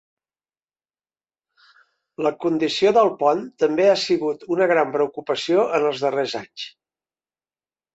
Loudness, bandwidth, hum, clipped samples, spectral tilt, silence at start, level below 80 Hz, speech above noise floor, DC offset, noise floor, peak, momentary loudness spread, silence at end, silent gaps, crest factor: -20 LUFS; 8.2 kHz; none; under 0.1%; -4.5 dB/octave; 2.2 s; -68 dBFS; over 70 dB; under 0.1%; under -90 dBFS; -4 dBFS; 9 LU; 1.25 s; none; 18 dB